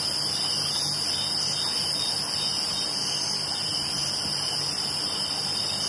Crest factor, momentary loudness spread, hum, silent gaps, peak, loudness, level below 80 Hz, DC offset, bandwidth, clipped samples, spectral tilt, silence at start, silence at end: 14 dB; 2 LU; none; none; -14 dBFS; -25 LUFS; -60 dBFS; under 0.1%; 11.5 kHz; under 0.1%; -1 dB/octave; 0 s; 0 s